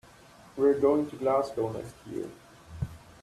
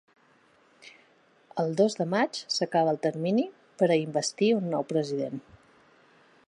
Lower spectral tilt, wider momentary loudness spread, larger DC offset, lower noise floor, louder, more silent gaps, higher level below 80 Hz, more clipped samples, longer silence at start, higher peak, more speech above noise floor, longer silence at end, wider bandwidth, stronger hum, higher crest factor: first, -7.5 dB/octave vs -5 dB/octave; first, 17 LU vs 8 LU; neither; second, -54 dBFS vs -62 dBFS; about the same, -29 LUFS vs -27 LUFS; neither; first, -56 dBFS vs -76 dBFS; neither; second, 0.55 s vs 0.85 s; about the same, -12 dBFS vs -12 dBFS; second, 26 dB vs 36 dB; second, 0.25 s vs 1.1 s; first, 13 kHz vs 11.5 kHz; neither; about the same, 18 dB vs 18 dB